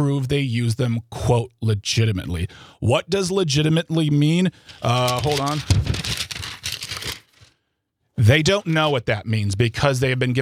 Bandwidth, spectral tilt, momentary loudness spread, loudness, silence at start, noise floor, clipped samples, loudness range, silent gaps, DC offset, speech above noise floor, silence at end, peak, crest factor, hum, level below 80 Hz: 15.5 kHz; -5.5 dB/octave; 10 LU; -21 LUFS; 0 s; -73 dBFS; under 0.1%; 3 LU; none; under 0.1%; 54 dB; 0 s; -2 dBFS; 18 dB; none; -42 dBFS